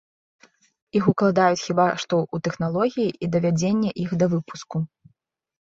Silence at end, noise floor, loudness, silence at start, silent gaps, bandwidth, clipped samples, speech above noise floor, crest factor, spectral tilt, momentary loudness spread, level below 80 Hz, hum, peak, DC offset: 0.9 s; -69 dBFS; -23 LUFS; 0.95 s; none; 7.8 kHz; under 0.1%; 48 dB; 20 dB; -6.5 dB/octave; 10 LU; -60 dBFS; none; -4 dBFS; under 0.1%